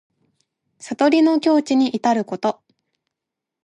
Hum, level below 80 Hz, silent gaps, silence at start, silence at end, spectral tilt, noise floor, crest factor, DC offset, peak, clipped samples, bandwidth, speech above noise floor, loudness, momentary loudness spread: none; -72 dBFS; none; 0.85 s; 1.15 s; -5 dB/octave; -84 dBFS; 16 dB; under 0.1%; -4 dBFS; under 0.1%; 10.5 kHz; 67 dB; -18 LUFS; 10 LU